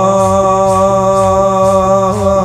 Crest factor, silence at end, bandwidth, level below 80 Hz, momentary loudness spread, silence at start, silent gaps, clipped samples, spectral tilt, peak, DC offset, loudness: 10 dB; 0 s; 13.5 kHz; -34 dBFS; 1 LU; 0 s; none; under 0.1%; -6.5 dB/octave; 0 dBFS; under 0.1%; -10 LUFS